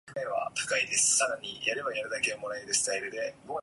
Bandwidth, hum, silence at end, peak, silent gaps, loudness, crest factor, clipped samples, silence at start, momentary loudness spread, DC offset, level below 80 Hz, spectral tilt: 12 kHz; none; 0 s; -14 dBFS; none; -29 LUFS; 18 dB; under 0.1%; 0.05 s; 12 LU; under 0.1%; -70 dBFS; 0 dB/octave